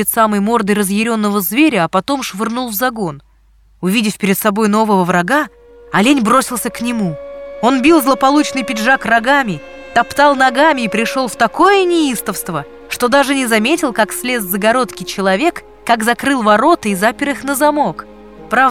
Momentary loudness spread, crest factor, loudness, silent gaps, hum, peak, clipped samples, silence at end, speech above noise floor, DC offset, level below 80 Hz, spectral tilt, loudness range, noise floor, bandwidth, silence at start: 9 LU; 14 dB; -14 LUFS; none; none; 0 dBFS; under 0.1%; 0 s; 35 dB; under 0.1%; -48 dBFS; -4 dB/octave; 3 LU; -49 dBFS; 18 kHz; 0 s